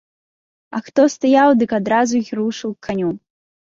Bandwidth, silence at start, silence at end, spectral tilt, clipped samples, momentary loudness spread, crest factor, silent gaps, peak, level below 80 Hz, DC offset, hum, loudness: 7.6 kHz; 0.7 s; 0.6 s; -5.5 dB/octave; under 0.1%; 14 LU; 16 dB; none; -2 dBFS; -60 dBFS; under 0.1%; none; -17 LUFS